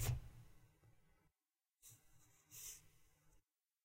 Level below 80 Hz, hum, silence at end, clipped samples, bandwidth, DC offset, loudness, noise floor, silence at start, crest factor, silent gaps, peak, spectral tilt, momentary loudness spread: -60 dBFS; none; 0.45 s; under 0.1%; 16 kHz; under 0.1%; -52 LUFS; under -90 dBFS; 0 s; 24 dB; none; -30 dBFS; -4 dB/octave; 19 LU